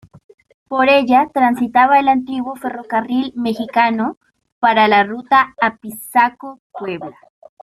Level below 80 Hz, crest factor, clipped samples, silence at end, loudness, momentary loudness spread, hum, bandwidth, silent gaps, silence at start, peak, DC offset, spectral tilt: -58 dBFS; 16 dB; under 0.1%; 0.5 s; -15 LUFS; 15 LU; none; 14.5 kHz; 4.17-4.21 s, 4.52-4.61 s, 6.59-6.70 s; 0.7 s; -2 dBFS; under 0.1%; -5 dB/octave